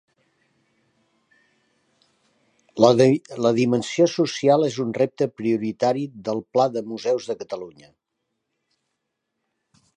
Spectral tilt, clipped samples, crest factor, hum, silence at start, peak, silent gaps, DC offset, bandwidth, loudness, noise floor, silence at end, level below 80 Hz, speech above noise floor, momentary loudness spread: -6 dB/octave; under 0.1%; 22 dB; none; 2.75 s; -2 dBFS; none; under 0.1%; 10 kHz; -21 LUFS; -78 dBFS; 2.25 s; -68 dBFS; 58 dB; 12 LU